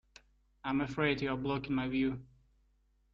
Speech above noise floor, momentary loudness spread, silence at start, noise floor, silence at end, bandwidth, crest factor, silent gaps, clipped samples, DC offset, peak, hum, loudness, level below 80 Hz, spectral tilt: 38 dB; 6 LU; 0.65 s; -72 dBFS; 0.9 s; 7.4 kHz; 18 dB; none; under 0.1%; under 0.1%; -20 dBFS; none; -34 LUFS; -60 dBFS; -7 dB/octave